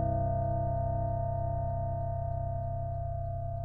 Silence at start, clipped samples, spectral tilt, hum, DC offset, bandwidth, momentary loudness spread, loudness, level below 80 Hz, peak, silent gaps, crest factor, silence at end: 0 s; under 0.1%; -13 dB/octave; none; 0.4%; 1.9 kHz; 5 LU; -34 LUFS; -42 dBFS; -20 dBFS; none; 12 dB; 0 s